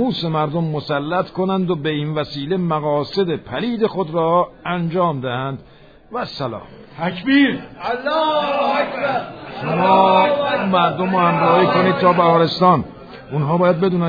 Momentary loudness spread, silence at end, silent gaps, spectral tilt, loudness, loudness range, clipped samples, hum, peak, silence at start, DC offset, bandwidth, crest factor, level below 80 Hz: 12 LU; 0 s; none; -8.5 dB/octave; -18 LUFS; 6 LU; under 0.1%; none; -2 dBFS; 0 s; under 0.1%; 5 kHz; 16 dB; -52 dBFS